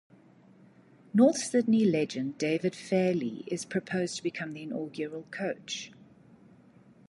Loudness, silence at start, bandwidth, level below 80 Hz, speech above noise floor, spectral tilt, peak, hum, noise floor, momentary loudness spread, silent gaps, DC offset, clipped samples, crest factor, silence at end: -30 LUFS; 1.15 s; 11.5 kHz; -74 dBFS; 29 dB; -5 dB/octave; -10 dBFS; none; -58 dBFS; 13 LU; none; under 0.1%; under 0.1%; 20 dB; 1.2 s